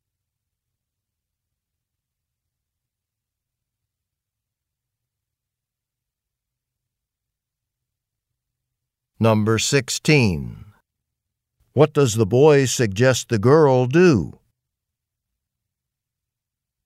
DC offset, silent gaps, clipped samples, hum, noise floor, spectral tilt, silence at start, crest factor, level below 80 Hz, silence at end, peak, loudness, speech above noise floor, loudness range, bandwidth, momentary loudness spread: under 0.1%; none; under 0.1%; none; -86 dBFS; -5.5 dB/octave; 9.2 s; 20 dB; -54 dBFS; 2.55 s; -2 dBFS; -17 LUFS; 69 dB; 7 LU; 16 kHz; 8 LU